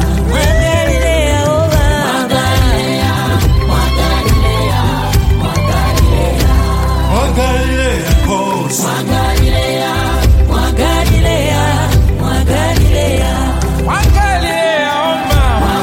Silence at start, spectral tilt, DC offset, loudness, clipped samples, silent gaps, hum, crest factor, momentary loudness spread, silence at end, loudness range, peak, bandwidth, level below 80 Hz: 0 s; -5 dB/octave; under 0.1%; -12 LUFS; under 0.1%; none; none; 10 dB; 3 LU; 0 s; 1 LU; 0 dBFS; 16.5 kHz; -14 dBFS